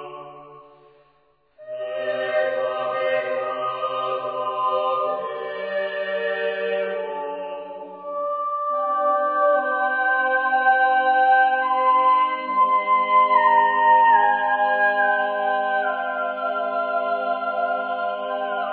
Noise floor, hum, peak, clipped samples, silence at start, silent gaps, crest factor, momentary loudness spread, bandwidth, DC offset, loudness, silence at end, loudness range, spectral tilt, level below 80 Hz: -62 dBFS; none; -6 dBFS; under 0.1%; 0 s; none; 16 dB; 12 LU; 4.9 kHz; under 0.1%; -21 LUFS; 0 s; 9 LU; -6.5 dB/octave; -82 dBFS